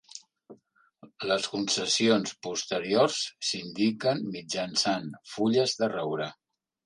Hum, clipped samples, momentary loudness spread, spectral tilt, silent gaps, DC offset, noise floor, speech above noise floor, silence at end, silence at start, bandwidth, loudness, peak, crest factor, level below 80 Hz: none; under 0.1%; 9 LU; -3.5 dB/octave; none; under 0.1%; -63 dBFS; 34 dB; 0.55 s; 0.15 s; 11 kHz; -28 LUFS; -10 dBFS; 20 dB; -72 dBFS